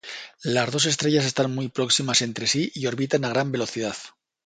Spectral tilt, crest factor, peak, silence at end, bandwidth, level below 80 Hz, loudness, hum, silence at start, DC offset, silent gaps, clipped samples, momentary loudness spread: -3.5 dB/octave; 18 dB; -6 dBFS; 0.35 s; 9.6 kHz; -64 dBFS; -23 LUFS; none; 0.05 s; under 0.1%; none; under 0.1%; 10 LU